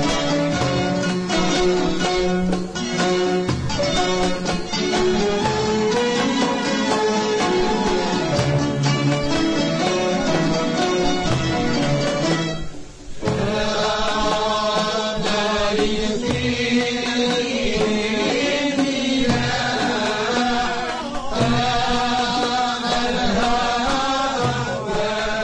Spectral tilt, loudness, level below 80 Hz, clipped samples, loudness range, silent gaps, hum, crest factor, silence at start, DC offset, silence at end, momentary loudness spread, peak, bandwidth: -4.5 dB/octave; -20 LUFS; -36 dBFS; under 0.1%; 2 LU; none; none; 14 dB; 0 s; under 0.1%; 0 s; 3 LU; -6 dBFS; 10.5 kHz